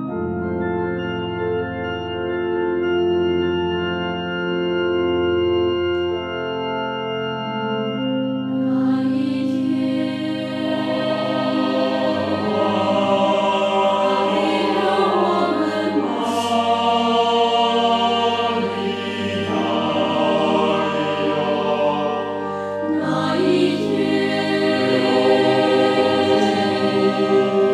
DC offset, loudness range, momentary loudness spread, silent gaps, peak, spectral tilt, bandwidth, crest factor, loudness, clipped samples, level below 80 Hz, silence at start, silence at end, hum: under 0.1%; 4 LU; 7 LU; none; -4 dBFS; -6 dB/octave; 12 kHz; 14 dB; -20 LUFS; under 0.1%; -54 dBFS; 0 s; 0 s; none